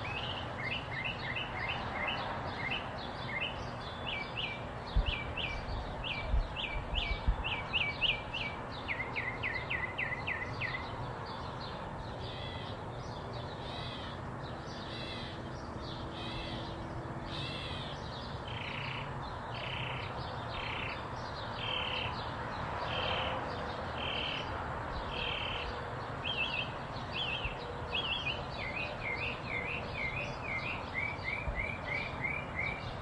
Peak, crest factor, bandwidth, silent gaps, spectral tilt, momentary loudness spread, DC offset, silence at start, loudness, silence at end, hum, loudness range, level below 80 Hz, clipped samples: -18 dBFS; 20 dB; 11.5 kHz; none; -5 dB/octave; 8 LU; under 0.1%; 0 s; -37 LUFS; 0 s; none; 7 LU; -46 dBFS; under 0.1%